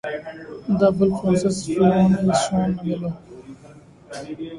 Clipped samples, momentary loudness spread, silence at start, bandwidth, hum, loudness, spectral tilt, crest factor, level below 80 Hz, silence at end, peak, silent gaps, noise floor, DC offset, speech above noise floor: under 0.1%; 19 LU; 0.05 s; 11.5 kHz; none; -20 LUFS; -6.5 dB/octave; 18 dB; -50 dBFS; 0 s; -4 dBFS; none; -46 dBFS; under 0.1%; 26 dB